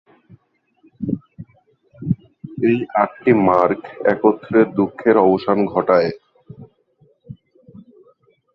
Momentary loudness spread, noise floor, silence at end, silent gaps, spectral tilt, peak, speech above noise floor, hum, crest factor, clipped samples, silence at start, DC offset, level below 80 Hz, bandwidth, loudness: 12 LU; -61 dBFS; 1.2 s; none; -10 dB/octave; -2 dBFS; 45 dB; none; 18 dB; under 0.1%; 1 s; under 0.1%; -56 dBFS; 5.8 kHz; -18 LUFS